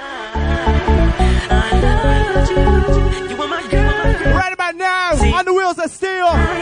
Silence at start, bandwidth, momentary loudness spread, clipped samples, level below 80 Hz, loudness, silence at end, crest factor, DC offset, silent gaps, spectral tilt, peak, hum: 0 s; 10.5 kHz; 6 LU; under 0.1%; -18 dBFS; -16 LUFS; 0 s; 12 dB; under 0.1%; none; -6 dB/octave; -2 dBFS; none